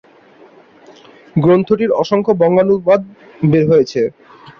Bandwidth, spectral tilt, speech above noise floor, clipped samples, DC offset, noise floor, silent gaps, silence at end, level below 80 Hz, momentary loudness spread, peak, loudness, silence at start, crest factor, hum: 7 kHz; -8.5 dB/octave; 32 dB; under 0.1%; under 0.1%; -45 dBFS; none; 0.5 s; -52 dBFS; 8 LU; -2 dBFS; -14 LUFS; 1.35 s; 14 dB; none